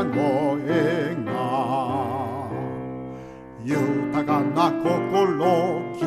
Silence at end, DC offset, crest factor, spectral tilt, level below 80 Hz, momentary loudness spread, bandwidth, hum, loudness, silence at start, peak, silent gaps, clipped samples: 0 s; under 0.1%; 16 dB; -7 dB/octave; -58 dBFS; 12 LU; 14.5 kHz; none; -23 LUFS; 0 s; -8 dBFS; none; under 0.1%